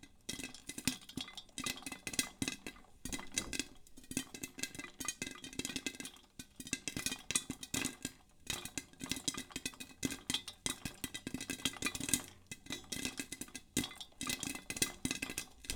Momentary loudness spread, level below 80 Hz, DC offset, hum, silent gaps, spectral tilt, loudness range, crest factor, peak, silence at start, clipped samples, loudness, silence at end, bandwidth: 10 LU; -62 dBFS; under 0.1%; none; none; -1.5 dB/octave; 3 LU; 30 dB; -12 dBFS; 0 s; under 0.1%; -41 LUFS; 0 s; over 20 kHz